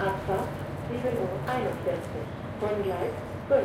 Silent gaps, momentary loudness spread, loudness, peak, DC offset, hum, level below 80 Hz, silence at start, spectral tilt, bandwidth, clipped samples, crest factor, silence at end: none; 7 LU; -31 LUFS; -12 dBFS; under 0.1%; none; -50 dBFS; 0 s; -7 dB/octave; 16.5 kHz; under 0.1%; 18 dB; 0 s